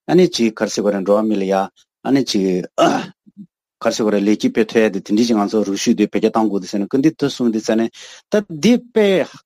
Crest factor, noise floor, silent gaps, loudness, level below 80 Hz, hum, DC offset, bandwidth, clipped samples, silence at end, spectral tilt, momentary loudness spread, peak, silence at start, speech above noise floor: 16 dB; -43 dBFS; none; -17 LUFS; -60 dBFS; none; under 0.1%; 15 kHz; under 0.1%; 0.1 s; -5.5 dB/octave; 6 LU; -2 dBFS; 0.1 s; 26 dB